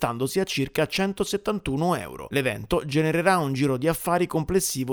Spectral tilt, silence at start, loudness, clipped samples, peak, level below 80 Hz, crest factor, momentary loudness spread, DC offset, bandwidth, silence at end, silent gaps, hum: -5 dB/octave; 0 s; -25 LUFS; under 0.1%; -6 dBFS; -46 dBFS; 18 dB; 5 LU; under 0.1%; over 20 kHz; 0 s; none; none